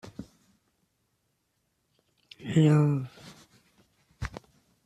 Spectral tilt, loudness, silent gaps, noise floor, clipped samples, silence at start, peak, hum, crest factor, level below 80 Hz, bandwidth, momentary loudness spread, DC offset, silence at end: -8 dB/octave; -25 LUFS; none; -76 dBFS; under 0.1%; 0.05 s; -10 dBFS; none; 20 dB; -56 dBFS; 8.6 kHz; 26 LU; under 0.1%; 0.5 s